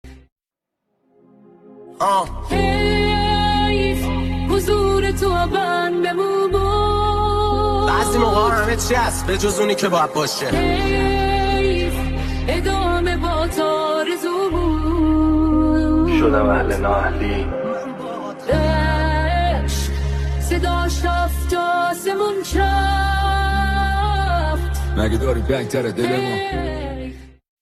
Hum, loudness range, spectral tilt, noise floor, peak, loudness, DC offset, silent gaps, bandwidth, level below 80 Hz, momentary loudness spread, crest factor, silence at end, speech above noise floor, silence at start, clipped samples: none; 3 LU; -5.5 dB/octave; -81 dBFS; -4 dBFS; -19 LUFS; under 0.1%; 0.32-0.36 s; 13.5 kHz; -24 dBFS; 6 LU; 14 dB; 0.3 s; 63 dB; 0.05 s; under 0.1%